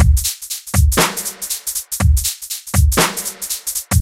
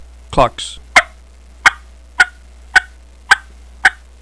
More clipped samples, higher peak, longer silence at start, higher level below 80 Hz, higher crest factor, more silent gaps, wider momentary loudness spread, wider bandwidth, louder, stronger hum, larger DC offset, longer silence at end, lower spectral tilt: second, under 0.1% vs 0.4%; about the same, 0 dBFS vs 0 dBFS; second, 0 s vs 0.3 s; first, -20 dBFS vs -36 dBFS; about the same, 16 dB vs 16 dB; neither; about the same, 8 LU vs 8 LU; first, 16.5 kHz vs 11 kHz; second, -17 LUFS vs -14 LUFS; neither; second, under 0.1% vs 0.3%; second, 0 s vs 0.3 s; first, -3.5 dB/octave vs -2 dB/octave